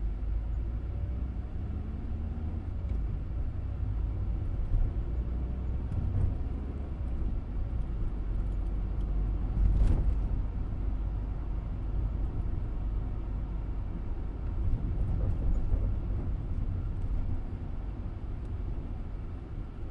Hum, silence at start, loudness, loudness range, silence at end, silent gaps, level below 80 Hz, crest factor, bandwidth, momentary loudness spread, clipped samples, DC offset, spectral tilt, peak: none; 0 s; -35 LUFS; 4 LU; 0 s; none; -32 dBFS; 16 dB; 3.6 kHz; 6 LU; under 0.1%; under 0.1%; -10 dB/octave; -16 dBFS